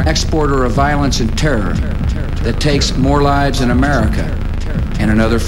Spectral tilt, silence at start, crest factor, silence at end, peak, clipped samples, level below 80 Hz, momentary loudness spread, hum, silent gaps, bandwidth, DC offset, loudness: -5.5 dB/octave; 0 s; 12 dB; 0 s; 0 dBFS; under 0.1%; -18 dBFS; 6 LU; none; none; 13 kHz; under 0.1%; -15 LUFS